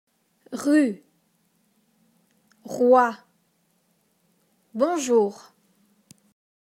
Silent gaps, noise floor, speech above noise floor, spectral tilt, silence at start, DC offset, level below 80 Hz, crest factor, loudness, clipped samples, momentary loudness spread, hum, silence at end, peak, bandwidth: none; -68 dBFS; 47 dB; -4.5 dB/octave; 0.5 s; under 0.1%; -78 dBFS; 22 dB; -22 LUFS; under 0.1%; 20 LU; none; 1.35 s; -6 dBFS; 15 kHz